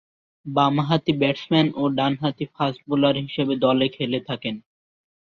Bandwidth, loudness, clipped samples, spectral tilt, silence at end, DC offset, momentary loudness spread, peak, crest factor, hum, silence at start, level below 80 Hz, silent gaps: 6.6 kHz; -22 LUFS; under 0.1%; -7.5 dB/octave; 0.6 s; under 0.1%; 8 LU; -4 dBFS; 18 dB; none; 0.45 s; -60 dBFS; none